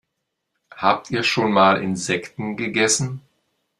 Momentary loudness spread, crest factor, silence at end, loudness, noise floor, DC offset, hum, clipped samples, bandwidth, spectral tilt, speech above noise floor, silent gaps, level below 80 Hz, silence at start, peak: 12 LU; 22 dB; 0.6 s; -20 LUFS; -78 dBFS; under 0.1%; none; under 0.1%; 13 kHz; -3.5 dB/octave; 58 dB; none; -60 dBFS; 0.75 s; 0 dBFS